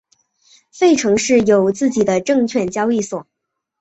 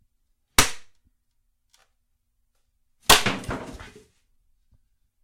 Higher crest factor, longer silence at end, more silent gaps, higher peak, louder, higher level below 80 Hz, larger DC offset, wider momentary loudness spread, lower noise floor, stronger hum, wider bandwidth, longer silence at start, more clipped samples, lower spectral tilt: second, 14 dB vs 24 dB; second, 0.6 s vs 1.4 s; neither; about the same, -2 dBFS vs -4 dBFS; first, -16 LUFS vs -20 LUFS; second, -54 dBFS vs -44 dBFS; neither; second, 7 LU vs 18 LU; second, -56 dBFS vs -71 dBFS; neither; second, 8.2 kHz vs 16.5 kHz; first, 0.75 s vs 0.6 s; neither; first, -4.5 dB/octave vs -1.5 dB/octave